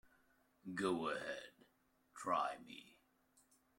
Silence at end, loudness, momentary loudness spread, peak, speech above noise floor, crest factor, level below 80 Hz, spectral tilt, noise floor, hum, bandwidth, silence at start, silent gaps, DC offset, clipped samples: 0.9 s; -43 LUFS; 18 LU; -24 dBFS; 35 dB; 22 dB; -82 dBFS; -4.5 dB/octave; -77 dBFS; none; 16.5 kHz; 0.65 s; none; under 0.1%; under 0.1%